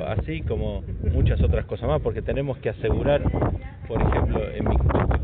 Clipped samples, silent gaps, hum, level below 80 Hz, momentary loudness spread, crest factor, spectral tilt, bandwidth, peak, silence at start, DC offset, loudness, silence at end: under 0.1%; none; none; -28 dBFS; 6 LU; 12 dB; -7.5 dB/octave; 4 kHz; -12 dBFS; 0 s; under 0.1%; -25 LUFS; 0 s